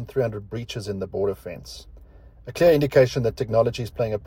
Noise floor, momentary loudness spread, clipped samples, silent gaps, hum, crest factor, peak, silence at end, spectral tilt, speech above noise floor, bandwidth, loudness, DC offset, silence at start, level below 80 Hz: -47 dBFS; 19 LU; under 0.1%; none; none; 20 dB; -4 dBFS; 0 s; -6.5 dB/octave; 24 dB; 16.5 kHz; -23 LUFS; under 0.1%; 0 s; -46 dBFS